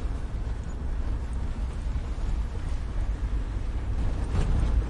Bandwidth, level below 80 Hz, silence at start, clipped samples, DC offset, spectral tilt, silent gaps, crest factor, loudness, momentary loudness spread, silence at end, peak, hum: 10.5 kHz; -28 dBFS; 0 s; under 0.1%; under 0.1%; -7 dB/octave; none; 14 dB; -32 LUFS; 6 LU; 0 s; -14 dBFS; none